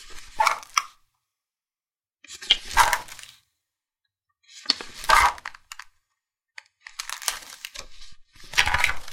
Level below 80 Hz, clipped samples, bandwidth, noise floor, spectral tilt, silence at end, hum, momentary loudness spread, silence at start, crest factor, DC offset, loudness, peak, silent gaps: -44 dBFS; under 0.1%; 17 kHz; under -90 dBFS; 0 dB/octave; 0 s; none; 24 LU; 0 s; 28 dB; under 0.1%; -22 LUFS; 0 dBFS; none